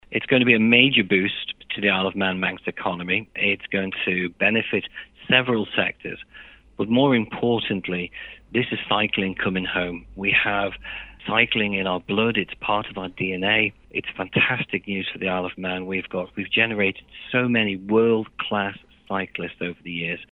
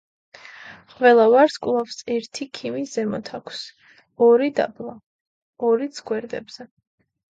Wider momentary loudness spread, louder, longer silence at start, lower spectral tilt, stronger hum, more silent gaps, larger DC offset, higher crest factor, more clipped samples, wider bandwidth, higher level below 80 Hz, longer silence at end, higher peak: second, 11 LU vs 24 LU; about the same, -22 LUFS vs -20 LUFS; second, 0.1 s vs 0.55 s; first, -8 dB/octave vs -4.5 dB/octave; neither; second, none vs 5.06-5.53 s; neither; first, 24 dB vs 18 dB; neither; second, 4.1 kHz vs 8 kHz; first, -54 dBFS vs -68 dBFS; second, 0.05 s vs 0.65 s; first, 0 dBFS vs -4 dBFS